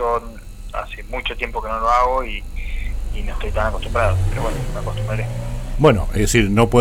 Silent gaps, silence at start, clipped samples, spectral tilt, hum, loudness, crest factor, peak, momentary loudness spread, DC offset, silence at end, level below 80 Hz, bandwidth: none; 0 s; under 0.1%; -5.5 dB/octave; none; -21 LUFS; 18 dB; 0 dBFS; 14 LU; under 0.1%; 0 s; -24 dBFS; 16 kHz